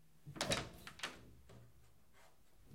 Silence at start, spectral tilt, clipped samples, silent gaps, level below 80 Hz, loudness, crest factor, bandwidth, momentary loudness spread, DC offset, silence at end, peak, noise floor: 0.15 s; -3 dB/octave; under 0.1%; none; -66 dBFS; -43 LUFS; 28 dB; 16 kHz; 23 LU; under 0.1%; 0 s; -20 dBFS; -69 dBFS